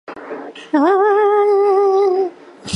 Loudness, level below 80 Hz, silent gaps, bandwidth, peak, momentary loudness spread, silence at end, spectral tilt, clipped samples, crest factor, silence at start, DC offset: -14 LUFS; -58 dBFS; none; 10.5 kHz; -4 dBFS; 17 LU; 0 s; -5 dB/octave; under 0.1%; 12 dB; 0.1 s; under 0.1%